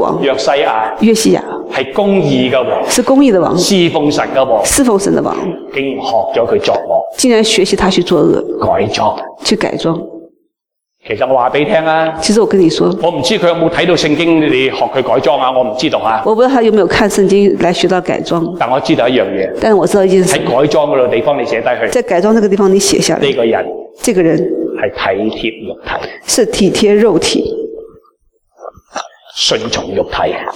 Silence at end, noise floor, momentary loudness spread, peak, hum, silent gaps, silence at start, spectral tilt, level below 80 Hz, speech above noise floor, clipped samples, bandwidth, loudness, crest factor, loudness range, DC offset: 0 s; -75 dBFS; 8 LU; 0 dBFS; none; none; 0 s; -4.5 dB/octave; -40 dBFS; 64 dB; under 0.1%; 17.5 kHz; -11 LUFS; 12 dB; 4 LU; under 0.1%